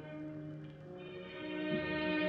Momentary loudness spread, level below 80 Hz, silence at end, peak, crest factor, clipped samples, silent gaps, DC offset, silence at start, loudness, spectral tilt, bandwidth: 14 LU; -66 dBFS; 0 s; -24 dBFS; 16 dB; under 0.1%; none; under 0.1%; 0 s; -41 LUFS; -8 dB/octave; 5.6 kHz